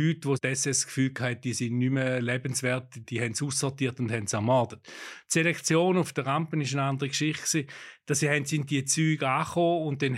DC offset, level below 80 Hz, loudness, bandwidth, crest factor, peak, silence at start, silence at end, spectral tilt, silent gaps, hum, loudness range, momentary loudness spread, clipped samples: under 0.1%; -72 dBFS; -27 LUFS; 15 kHz; 18 dB; -10 dBFS; 0 s; 0 s; -4.5 dB/octave; none; none; 2 LU; 6 LU; under 0.1%